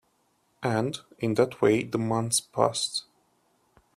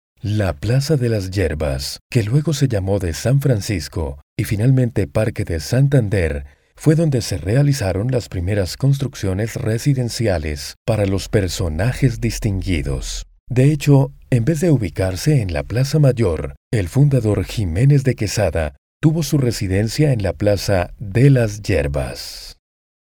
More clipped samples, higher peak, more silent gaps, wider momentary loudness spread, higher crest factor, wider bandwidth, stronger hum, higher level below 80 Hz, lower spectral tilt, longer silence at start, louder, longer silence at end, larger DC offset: neither; second, -6 dBFS vs 0 dBFS; second, none vs 2.01-2.10 s, 4.23-4.36 s, 10.77-10.85 s, 13.40-13.47 s, 16.57-16.71 s, 18.78-19.00 s; about the same, 9 LU vs 8 LU; about the same, 22 dB vs 18 dB; second, 15 kHz vs 17.5 kHz; neither; second, -66 dBFS vs -34 dBFS; second, -4.5 dB/octave vs -6.5 dB/octave; first, 0.6 s vs 0.25 s; second, -27 LUFS vs -18 LUFS; first, 0.95 s vs 0.65 s; neither